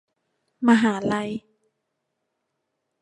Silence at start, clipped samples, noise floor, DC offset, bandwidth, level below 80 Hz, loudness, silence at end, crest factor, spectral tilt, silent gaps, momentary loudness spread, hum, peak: 0.6 s; under 0.1%; -78 dBFS; under 0.1%; 10 kHz; -66 dBFS; -22 LUFS; 1.6 s; 22 dB; -6 dB/octave; none; 14 LU; none; -4 dBFS